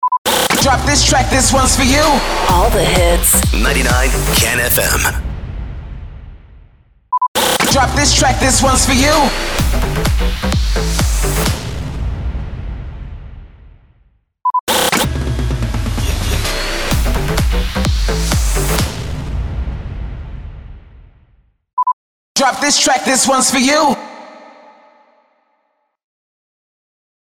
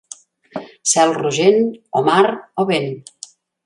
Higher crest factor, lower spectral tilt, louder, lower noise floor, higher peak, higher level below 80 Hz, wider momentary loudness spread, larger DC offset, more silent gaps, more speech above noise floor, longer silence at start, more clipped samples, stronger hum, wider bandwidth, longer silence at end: about the same, 14 dB vs 18 dB; about the same, -3 dB/octave vs -3.5 dB/octave; about the same, -14 LUFS vs -16 LUFS; first, -65 dBFS vs -41 dBFS; about the same, -2 dBFS vs 0 dBFS; first, -20 dBFS vs -66 dBFS; second, 17 LU vs 23 LU; neither; first, 0.18-0.25 s, 7.28-7.35 s, 14.60-14.67 s, 21.73-21.77 s, 21.93-22.35 s vs none; first, 53 dB vs 25 dB; second, 0 s vs 0.55 s; neither; neither; first, over 20 kHz vs 11.5 kHz; first, 2.9 s vs 0.65 s